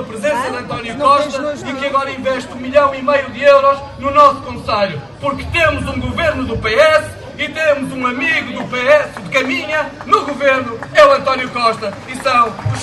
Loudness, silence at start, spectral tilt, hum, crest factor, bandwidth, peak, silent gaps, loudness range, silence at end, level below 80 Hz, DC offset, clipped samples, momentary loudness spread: -14 LUFS; 0 s; -4.5 dB/octave; none; 14 dB; 12 kHz; 0 dBFS; none; 2 LU; 0 s; -38 dBFS; under 0.1%; 0.1%; 11 LU